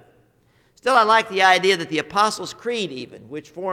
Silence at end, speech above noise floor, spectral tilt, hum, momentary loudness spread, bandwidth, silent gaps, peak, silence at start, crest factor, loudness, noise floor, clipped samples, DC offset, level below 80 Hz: 0 s; 40 dB; -3 dB/octave; none; 20 LU; 16 kHz; none; -2 dBFS; 0.85 s; 18 dB; -19 LUFS; -60 dBFS; under 0.1%; under 0.1%; -64 dBFS